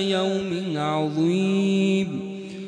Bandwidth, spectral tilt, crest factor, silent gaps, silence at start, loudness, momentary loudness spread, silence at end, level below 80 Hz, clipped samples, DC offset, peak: 10 kHz; -6.5 dB/octave; 12 dB; none; 0 s; -23 LUFS; 8 LU; 0 s; -66 dBFS; under 0.1%; under 0.1%; -12 dBFS